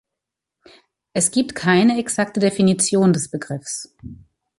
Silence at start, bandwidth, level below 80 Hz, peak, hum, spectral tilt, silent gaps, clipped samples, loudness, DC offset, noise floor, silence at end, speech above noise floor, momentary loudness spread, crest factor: 1.15 s; 11.5 kHz; -56 dBFS; -4 dBFS; none; -4.5 dB/octave; none; under 0.1%; -19 LUFS; under 0.1%; -84 dBFS; 0.45 s; 65 dB; 12 LU; 16 dB